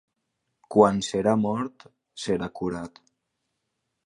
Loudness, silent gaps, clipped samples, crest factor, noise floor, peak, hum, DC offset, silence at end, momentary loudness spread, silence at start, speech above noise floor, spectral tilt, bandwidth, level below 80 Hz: -25 LUFS; none; under 0.1%; 24 dB; -79 dBFS; -4 dBFS; none; under 0.1%; 1.15 s; 16 LU; 0.7 s; 55 dB; -6 dB/octave; 11 kHz; -58 dBFS